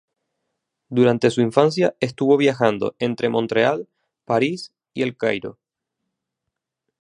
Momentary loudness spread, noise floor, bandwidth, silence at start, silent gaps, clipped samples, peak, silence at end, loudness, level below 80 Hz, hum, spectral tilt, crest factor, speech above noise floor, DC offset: 10 LU; -82 dBFS; 11 kHz; 0.9 s; none; under 0.1%; 0 dBFS; 1.5 s; -20 LUFS; -64 dBFS; none; -6 dB/octave; 20 dB; 63 dB; under 0.1%